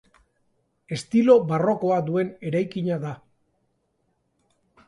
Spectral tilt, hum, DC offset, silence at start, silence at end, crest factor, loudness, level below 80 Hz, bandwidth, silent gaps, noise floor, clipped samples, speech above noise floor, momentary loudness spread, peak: -7.5 dB/octave; none; under 0.1%; 0.9 s; 1.75 s; 20 dB; -23 LUFS; -66 dBFS; 11.5 kHz; none; -72 dBFS; under 0.1%; 50 dB; 16 LU; -4 dBFS